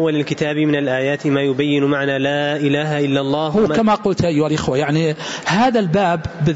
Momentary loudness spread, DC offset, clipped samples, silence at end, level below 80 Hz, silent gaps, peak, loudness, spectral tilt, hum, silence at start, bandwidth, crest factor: 4 LU; under 0.1%; under 0.1%; 0 s; -48 dBFS; none; -4 dBFS; -17 LUFS; -6 dB/octave; none; 0 s; 8 kHz; 14 dB